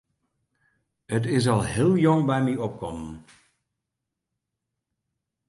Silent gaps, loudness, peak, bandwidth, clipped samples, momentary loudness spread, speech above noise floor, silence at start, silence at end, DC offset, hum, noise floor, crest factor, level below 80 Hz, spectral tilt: none; -24 LUFS; -8 dBFS; 11.5 kHz; under 0.1%; 16 LU; 61 dB; 1.1 s; 2.3 s; under 0.1%; none; -84 dBFS; 18 dB; -52 dBFS; -6.5 dB/octave